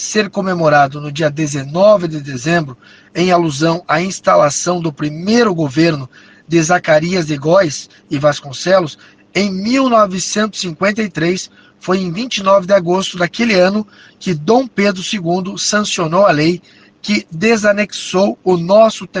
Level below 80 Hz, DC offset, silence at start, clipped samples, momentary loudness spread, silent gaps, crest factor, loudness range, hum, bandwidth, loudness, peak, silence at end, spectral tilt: -52 dBFS; under 0.1%; 0 s; under 0.1%; 10 LU; none; 14 dB; 1 LU; none; 10 kHz; -14 LUFS; 0 dBFS; 0 s; -4.5 dB/octave